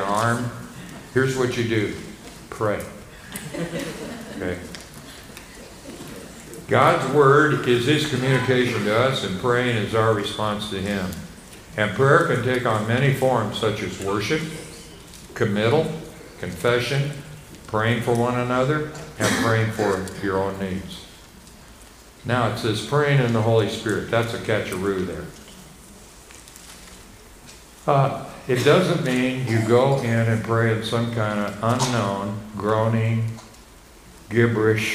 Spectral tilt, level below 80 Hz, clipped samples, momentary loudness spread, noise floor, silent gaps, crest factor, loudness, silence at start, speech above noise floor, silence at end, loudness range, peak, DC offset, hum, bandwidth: -5.5 dB/octave; -50 dBFS; under 0.1%; 20 LU; -46 dBFS; none; 22 dB; -22 LUFS; 0 s; 25 dB; 0 s; 9 LU; -2 dBFS; under 0.1%; none; 15.5 kHz